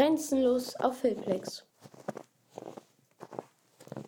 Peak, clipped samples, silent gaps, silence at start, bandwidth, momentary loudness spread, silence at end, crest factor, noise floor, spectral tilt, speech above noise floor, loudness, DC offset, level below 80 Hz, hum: -12 dBFS; under 0.1%; none; 0 s; 18.5 kHz; 21 LU; 0.05 s; 22 dB; -58 dBFS; -5 dB/octave; 28 dB; -31 LUFS; under 0.1%; -72 dBFS; none